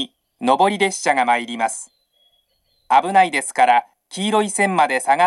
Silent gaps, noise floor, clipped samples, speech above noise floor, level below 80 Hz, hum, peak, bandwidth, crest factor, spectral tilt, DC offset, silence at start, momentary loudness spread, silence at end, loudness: none; -65 dBFS; under 0.1%; 48 dB; -72 dBFS; none; 0 dBFS; 12.5 kHz; 18 dB; -3 dB/octave; under 0.1%; 0 s; 10 LU; 0 s; -18 LUFS